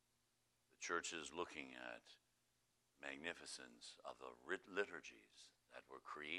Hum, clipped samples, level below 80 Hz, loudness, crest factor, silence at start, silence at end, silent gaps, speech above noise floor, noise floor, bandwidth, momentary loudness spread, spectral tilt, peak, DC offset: none; under 0.1%; -86 dBFS; -51 LUFS; 26 dB; 0.8 s; 0 s; none; 33 dB; -84 dBFS; 12.5 kHz; 17 LU; -1.5 dB/octave; -26 dBFS; under 0.1%